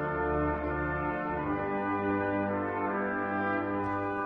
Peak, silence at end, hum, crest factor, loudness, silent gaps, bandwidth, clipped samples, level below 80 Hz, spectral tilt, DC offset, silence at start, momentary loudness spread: -20 dBFS; 0 s; none; 12 dB; -31 LUFS; none; 5.2 kHz; under 0.1%; -48 dBFS; -9.5 dB/octave; under 0.1%; 0 s; 2 LU